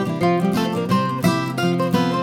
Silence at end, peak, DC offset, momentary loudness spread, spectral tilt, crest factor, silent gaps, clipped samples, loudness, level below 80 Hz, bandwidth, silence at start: 0 s; -4 dBFS; under 0.1%; 2 LU; -6.5 dB/octave; 14 dB; none; under 0.1%; -20 LUFS; -54 dBFS; 17 kHz; 0 s